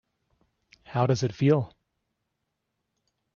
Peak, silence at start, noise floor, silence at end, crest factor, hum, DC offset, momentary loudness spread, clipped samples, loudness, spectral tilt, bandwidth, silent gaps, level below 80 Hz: -10 dBFS; 0.9 s; -81 dBFS; 1.7 s; 20 dB; none; under 0.1%; 10 LU; under 0.1%; -26 LUFS; -7 dB/octave; 7.2 kHz; none; -62 dBFS